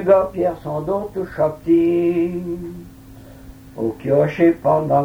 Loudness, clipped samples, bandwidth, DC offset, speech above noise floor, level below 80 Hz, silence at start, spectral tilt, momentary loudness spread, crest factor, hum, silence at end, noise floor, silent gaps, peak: -19 LUFS; under 0.1%; 15.5 kHz; under 0.1%; 23 dB; -46 dBFS; 0 s; -9 dB/octave; 13 LU; 16 dB; none; 0 s; -40 dBFS; none; -2 dBFS